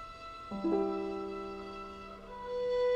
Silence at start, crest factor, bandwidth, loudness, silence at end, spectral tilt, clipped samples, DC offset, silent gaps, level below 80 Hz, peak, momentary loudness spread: 0 s; 16 dB; 9 kHz; -37 LUFS; 0 s; -7 dB/octave; under 0.1%; under 0.1%; none; -58 dBFS; -20 dBFS; 14 LU